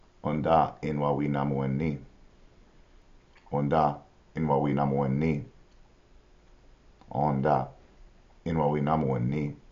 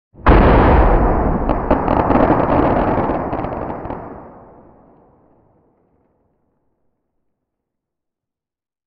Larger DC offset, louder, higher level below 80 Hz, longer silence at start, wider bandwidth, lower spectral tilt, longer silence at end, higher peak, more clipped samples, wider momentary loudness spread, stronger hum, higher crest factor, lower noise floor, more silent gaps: neither; second, -28 LUFS vs -15 LUFS; second, -52 dBFS vs -22 dBFS; about the same, 0.25 s vs 0.2 s; first, 7 kHz vs 5.2 kHz; second, -8 dB/octave vs -10.5 dB/octave; second, 0.15 s vs 4.55 s; second, -10 dBFS vs 0 dBFS; neither; second, 11 LU vs 16 LU; neither; about the same, 20 dB vs 16 dB; second, -57 dBFS vs -88 dBFS; neither